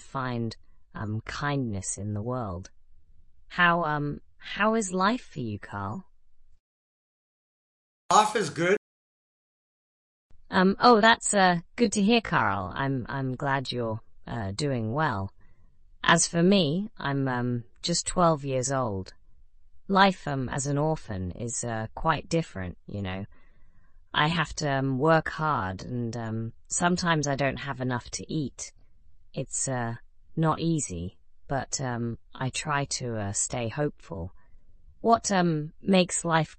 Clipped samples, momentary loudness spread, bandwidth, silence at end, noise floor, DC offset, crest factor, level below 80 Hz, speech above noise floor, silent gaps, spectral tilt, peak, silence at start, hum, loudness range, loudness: under 0.1%; 15 LU; 11.5 kHz; 0.05 s; -52 dBFS; under 0.1%; 22 dB; -52 dBFS; 26 dB; 6.60-8.09 s, 8.77-10.30 s; -4.5 dB/octave; -6 dBFS; 0 s; none; 7 LU; -27 LUFS